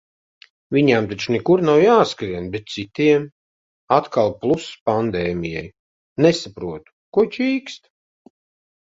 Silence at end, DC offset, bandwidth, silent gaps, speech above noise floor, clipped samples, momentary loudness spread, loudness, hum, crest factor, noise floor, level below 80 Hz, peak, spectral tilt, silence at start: 1.15 s; under 0.1%; 7.8 kHz; 3.32-3.88 s, 4.81-4.86 s, 5.79-6.16 s, 6.92-7.12 s; over 71 dB; under 0.1%; 16 LU; -19 LUFS; none; 20 dB; under -90 dBFS; -52 dBFS; 0 dBFS; -6 dB/octave; 0.7 s